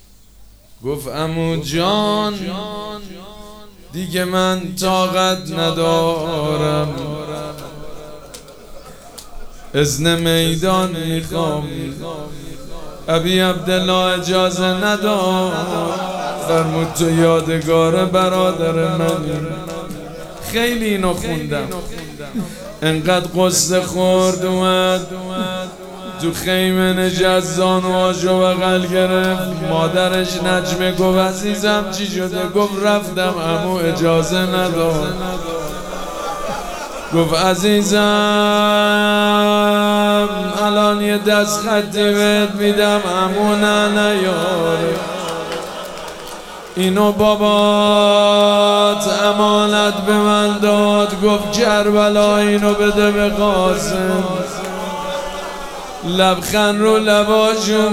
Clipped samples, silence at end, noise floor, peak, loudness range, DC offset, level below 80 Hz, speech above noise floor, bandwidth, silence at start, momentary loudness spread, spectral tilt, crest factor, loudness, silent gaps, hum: under 0.1%; 0 s; -43 dBFS; 0 dBFS; 7 LU; under 0.1%; -40 dBFS; 28 dB; over 20 kHz; 0.4 s; 14 LU; -4.5 dB/octave; 16 dB; -16 LUFS; none; none